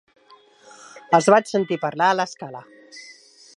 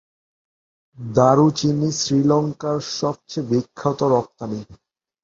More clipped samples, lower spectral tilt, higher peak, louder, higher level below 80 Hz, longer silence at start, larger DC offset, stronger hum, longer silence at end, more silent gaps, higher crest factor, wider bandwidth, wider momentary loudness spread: neither; second, -4.5 dB/octave vs -6 dB/octave; about the same, -2 dBFS vs -2 dBFS; about the same, -19 LUFS vs -20 LUFS; second, -76 dBFS vs -56 dBFS; about the same, 0.95 s vs 1 s; neither; neither; about the same, 0.55 s vs 0.5 s; neither; about the same, 22 dB vs 20 dB; first, 11.5 kHz vs 7.8 kHz; first, 25 LU vs 14 LU